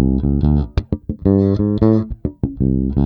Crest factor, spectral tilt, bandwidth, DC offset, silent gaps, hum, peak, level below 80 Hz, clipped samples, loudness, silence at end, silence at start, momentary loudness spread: 16 dB; -11.5 dB/octave; 5.4 kHz; under 0.1%; none; none; 0 dBFS; -24 dBFS; under 0.1%; -17 LUFS; 0 s; 0 s; 9 LU